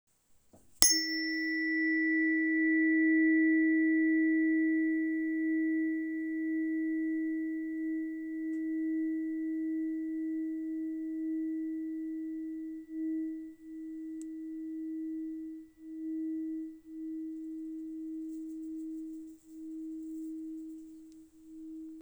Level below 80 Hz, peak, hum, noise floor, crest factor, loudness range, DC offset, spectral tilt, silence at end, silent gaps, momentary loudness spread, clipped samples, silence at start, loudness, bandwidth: -70 dBFS; 0 dBFS; none; -64 dBFS; 34 dB; 15 LU; under 0.1%; -1.5 dB/octave; 0 s; none; 18 LU; under 0.1%; 0.8 s; -32 LUFS; over 20 kHz